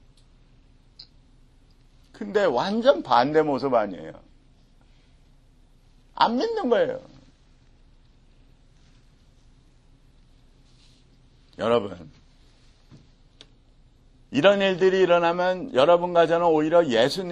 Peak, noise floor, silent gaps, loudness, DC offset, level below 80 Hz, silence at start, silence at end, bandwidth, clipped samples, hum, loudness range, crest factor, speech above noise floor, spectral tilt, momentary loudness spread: -4 dBFS; -56 dBFS; none; -22 LUFS; under 0.1%; -56 dBFS; 2.15 s; 0 s; 12 kHz; under 0.1%; none; 12 LU; 22 dB; 34 dB; -5.5 dB/octave; 13 LU